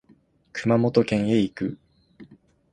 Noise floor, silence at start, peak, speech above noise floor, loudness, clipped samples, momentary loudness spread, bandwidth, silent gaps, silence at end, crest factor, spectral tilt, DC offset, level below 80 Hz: -59 dBFS; 0.55 s; -4 dBFS; 37 dB; -23 LUFS; under 0.1%; 14 LU; 9.6 kHz; none; 0.5 s; 20 dB; -7.5 dB/octave; under 0.1%; -58 dBFS